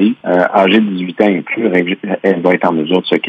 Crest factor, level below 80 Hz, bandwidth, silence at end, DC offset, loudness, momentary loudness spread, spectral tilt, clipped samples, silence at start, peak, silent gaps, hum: 12 dB; -64 dBFS; 6.8 kHz; 0 s; under 0.1%; -13 LUFS; 5 LU; -8 dB/octave; under 0.1%; 0 s; 0 dBFS; none; none